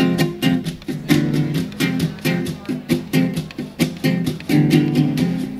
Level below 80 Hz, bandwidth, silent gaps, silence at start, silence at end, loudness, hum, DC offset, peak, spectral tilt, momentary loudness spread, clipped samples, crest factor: -48 dBFS; 16 kHz; none; 0 s; 0 s; -19 LUFS; none; under 0.1%; -2 dBFS; -6 dB/octave; 9 LU; under 0.1%; 18 dB